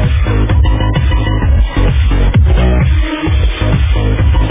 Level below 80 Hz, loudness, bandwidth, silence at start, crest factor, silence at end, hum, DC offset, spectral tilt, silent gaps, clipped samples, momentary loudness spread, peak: -12 dBFS; -12 LUFS; 3.8 kHz; 0 s; 8 dB; 0 s; none; under 0.1%; -11 dB/octave; none; under 0.1%; 3 LU; -2 dBFS